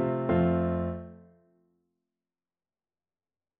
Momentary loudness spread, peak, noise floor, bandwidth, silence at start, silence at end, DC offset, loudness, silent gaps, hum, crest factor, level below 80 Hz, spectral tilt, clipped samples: 16 LU; -14 dBFS; under -90 dBFS; 3.7 kHz; 0 s; 2.45 s; under 0.1%; -28 LUFS; none; none; 18 dB; -52 dBFS; -8.5 dB/octave; under 0.1%